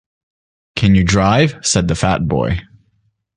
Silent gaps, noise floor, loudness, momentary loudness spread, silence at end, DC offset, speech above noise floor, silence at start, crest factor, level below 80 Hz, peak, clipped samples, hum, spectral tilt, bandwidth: none; -62 dBFS; -15 LUFS; 8 LU; 0.75 s; under 0.1%; 48 dB; 0.75 s; 14 dB; -32 dBFS; -2 dBFS; under 0.1%; none; -5 dB/octave; 10.5 kHz